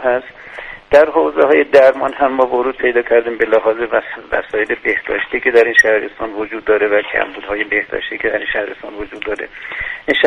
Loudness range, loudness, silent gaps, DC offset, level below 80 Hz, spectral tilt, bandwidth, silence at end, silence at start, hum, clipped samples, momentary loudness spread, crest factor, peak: 5 LU; -15 LUFS; none; under 0.1%; -46 dBFS; -4 dB/octave; 10 kHz; 0 s; 0 s; none; 0.1%; 14 LU; 14 dB; 0 dBFS